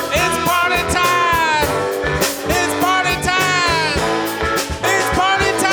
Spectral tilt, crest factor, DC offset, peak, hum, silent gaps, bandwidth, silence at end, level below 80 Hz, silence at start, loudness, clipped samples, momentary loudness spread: -3 dB/octave; 14 dB; under 0.1%; -2 dBFS; none; none; over 20 kHz; 0 s; -34 dBFS; 0 s; -16 LUFS; under 0.1%; 4 LU